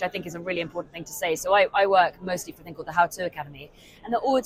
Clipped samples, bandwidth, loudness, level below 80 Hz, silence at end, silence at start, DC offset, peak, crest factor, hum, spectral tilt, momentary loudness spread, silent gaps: under 0.1%; 16 kHz; -25 LUFS; -58 dBFS; 0 s; 0 s; under 0.1%; -6 dBFS; 18 dB; none; -3.5 dB/octave; 19 LU; none